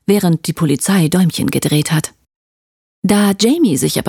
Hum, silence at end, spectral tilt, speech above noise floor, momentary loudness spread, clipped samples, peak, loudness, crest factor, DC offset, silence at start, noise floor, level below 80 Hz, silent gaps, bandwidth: none; 0 s; -5 dB/octave; over 77 dB; 5 LU; under 0.1%; -2 dBFS; -14 LUFS; 12 dB; under 0.1%; 0.1 s; under -90 dBFS; -50 dBFS; 2.36-3.02 s; 18.5 kHz